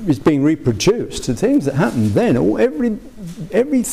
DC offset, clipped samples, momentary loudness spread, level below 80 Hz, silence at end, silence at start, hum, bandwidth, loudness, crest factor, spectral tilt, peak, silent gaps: 0.6%; under 0.1%; 7 LU; -40 dBFS; 0 s; 0 s; none; 15.5 kHz; -17 LUFS; 10 dB; -6 dB/octave; -6 dBFS; none